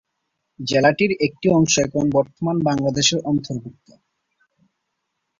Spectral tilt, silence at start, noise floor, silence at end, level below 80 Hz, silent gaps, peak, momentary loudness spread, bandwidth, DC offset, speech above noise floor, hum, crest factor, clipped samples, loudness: -4.5 dB/octave; 0.6 s; -76 dBFS; 1.7 s; -54 dBFS; none; -4 dBFS; 7 LU; 7.8 kHz; under 0.1%; 57 dB; none; 18 dB; under 0.1%; -19 LUFS